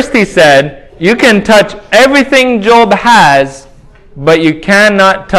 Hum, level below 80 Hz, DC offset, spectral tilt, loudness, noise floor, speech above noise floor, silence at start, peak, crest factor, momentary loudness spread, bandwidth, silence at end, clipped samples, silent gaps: none; -38 dBFS; under 0.1%; -4.5 dB/octave; -6 LUFS; -36 dBFS; 29 dB; 0 s; 0 dBFS; 8 dB; 6 LU; 16 kHz; 0 s; 5%; none